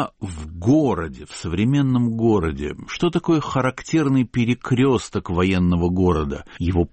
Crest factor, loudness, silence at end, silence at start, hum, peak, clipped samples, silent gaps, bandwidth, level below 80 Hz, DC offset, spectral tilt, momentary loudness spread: 12 dB; -20 LUFS; 0.05 s; 0 s; none; -8 dBFS; under 0.1%; none; 8.8 kHz; -38 dBFS; under 0.1%; -7 dB/octave; 10 LU